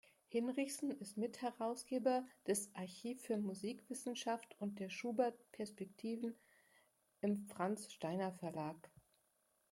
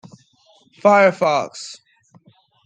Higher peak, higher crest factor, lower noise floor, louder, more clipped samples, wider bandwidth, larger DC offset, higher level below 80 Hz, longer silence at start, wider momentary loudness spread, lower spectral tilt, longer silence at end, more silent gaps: second, -24 dBFS vs -2 dBFS; about the same, 20 dB vs 18 dB; first, -81 dBFS vs -56 dBFS; second, -43 LUFS vs -16 LUFS; neither; first, 16.5 kHz vs 9.4 kHz; neither; second, -88 dBFS vs -74 dBFS; second, 0.3 s vs 0.85 s; second, 9 LU vs 20 LU; about the same, -5 dB/octave vs -5 dB/octave; about the same, 0.85 s vs 0.9 s; neither